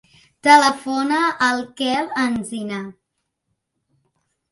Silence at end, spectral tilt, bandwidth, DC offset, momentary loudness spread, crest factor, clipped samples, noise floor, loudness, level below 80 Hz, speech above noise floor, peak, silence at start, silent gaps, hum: 1.6 s; -3 dB/octave; 11.5 kHz; under 0.1%; 15 LU; 20 dB; under 0.1%; -76 dBFS; -18 LUFS; -62 dBFS; 57 dB; 0 dBFS; 0.45 s; none; none